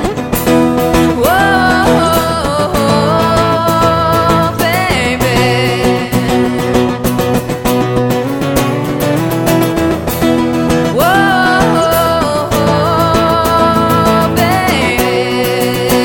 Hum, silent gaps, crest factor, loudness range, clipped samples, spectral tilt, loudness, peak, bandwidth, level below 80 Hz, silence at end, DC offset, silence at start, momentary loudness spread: none; none; 10 dB; 3 LU; under 0.1%; -5 dB/octave; -11 LUFS; 0 dBFS; 19 kHz; -30 dBFS; 0 s; under 0.1%; 0 s; 4 LU